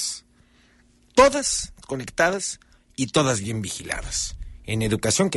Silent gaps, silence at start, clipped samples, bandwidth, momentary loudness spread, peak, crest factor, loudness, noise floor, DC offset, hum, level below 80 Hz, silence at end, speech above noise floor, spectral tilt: none; 0 s; under 0.1%; 12 kHz; 15 LU; -2 dBFS; 22 dB; -23 LUFS; -58 dBFS; under 0.1%; none; -42 dBFS; 0 s; 34 dB; -3.5 dB/octave